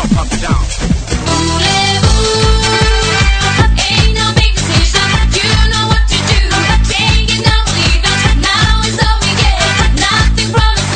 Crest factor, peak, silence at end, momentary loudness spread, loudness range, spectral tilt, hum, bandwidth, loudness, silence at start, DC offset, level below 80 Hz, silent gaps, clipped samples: 10 dB; 0 dBFS; 0 s; 3 LU; 1 LU; -3.5 dB/octave; none; 9.4 kHz; -11 LUFS; 0 s; under 0.1%; -14 dBFS; none; under 0.1%